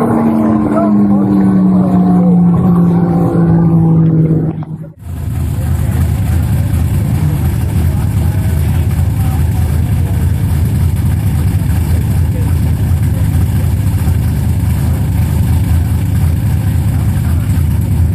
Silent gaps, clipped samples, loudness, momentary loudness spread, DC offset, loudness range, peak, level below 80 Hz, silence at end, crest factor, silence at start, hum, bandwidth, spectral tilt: none; under 0.1%; -12 LUFS; 4 LU; under 0.1%; 4 LU; 0 dBFS; -20 dBFS; 0 s; 10 dB; 0 s; none; 15 kHz; -8.5 dB/octave